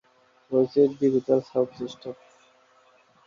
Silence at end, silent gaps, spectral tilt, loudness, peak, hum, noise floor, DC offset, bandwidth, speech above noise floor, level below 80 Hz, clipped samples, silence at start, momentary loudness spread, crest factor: 1.15 s; none; -8 dB/octave; -24 LUFS; -8 dBFS; none; -60 dBFS; under 0.1%; 7.2 kHz; 36 dB; -70 dBFS; under 0.1%; 0.5 s; 18 LU; 18 dB